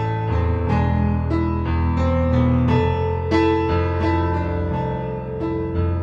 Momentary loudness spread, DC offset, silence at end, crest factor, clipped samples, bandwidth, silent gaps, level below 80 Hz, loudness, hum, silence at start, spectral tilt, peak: 6 LU; under 0.1%; 0 s; 14 dB; under 0.1%; 6.4 kHz; none; -28 dBFS; -21 LUFS; none; 0 s; -9 dB/octave; -6 dBFS